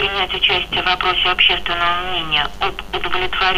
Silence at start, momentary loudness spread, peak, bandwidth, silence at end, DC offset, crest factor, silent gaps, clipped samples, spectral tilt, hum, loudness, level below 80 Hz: 0 s; 8 LU; -2 dBFS; 15.5 kHz; 0 s; under 0.1%; 14 dB; none; under 0.1%; -3.5 dB/octave; none; -16 LUFS; -36 dBFS